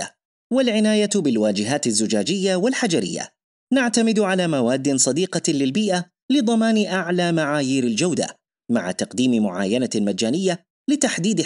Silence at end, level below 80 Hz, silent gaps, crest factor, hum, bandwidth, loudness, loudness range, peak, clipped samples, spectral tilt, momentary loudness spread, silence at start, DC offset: 0 s; -70 dBFS; 0.25-0.50 s, 3.44-3.67 s, 6.22-6.29 s, 10.70-10.85 s; 16 dB; none; 11.5 kHz; -20 LUFS; 2 LU; -4 dBFS; under 0.1%; -4 dB/octave; 6 LU; 0 s; under 0.1%